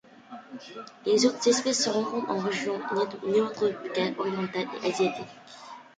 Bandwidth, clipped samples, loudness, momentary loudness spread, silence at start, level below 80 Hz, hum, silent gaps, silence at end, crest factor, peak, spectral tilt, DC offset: 9.6 kHz; under 0.1%; -27 LUFS; 20 LU; 0.3 s; -72 dBFS; none; none; 0.15 s; 18 dB; -10 dBFS; -3.5 dB/octave; under 0.1%